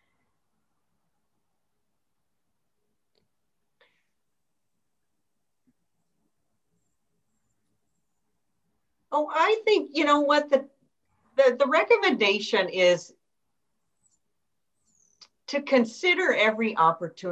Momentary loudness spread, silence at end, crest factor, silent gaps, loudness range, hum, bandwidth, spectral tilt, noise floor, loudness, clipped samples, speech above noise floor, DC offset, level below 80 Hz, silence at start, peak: 8 LU; 0 s; 20 dB; none; 8 LU; none; 8.4 kHz; -4 dB/octave; -84 dBFS; -23 LUFS; under 0.1%; 61 dB; under 0.1%; -80 dBFS; 9.1 s; -8 dBFS